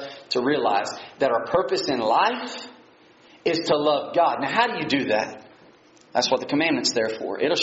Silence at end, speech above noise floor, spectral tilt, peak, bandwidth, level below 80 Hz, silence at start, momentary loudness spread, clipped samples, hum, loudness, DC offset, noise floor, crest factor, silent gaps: 0 s; 30 dB; -2 dB/octave; -6 dBFS; 8 kHz; -64 dBFS; 0 s; 8 LU; under 0.1%; none; -23 LUFS; under 0.1%; -53 dBFS; 18 dB; none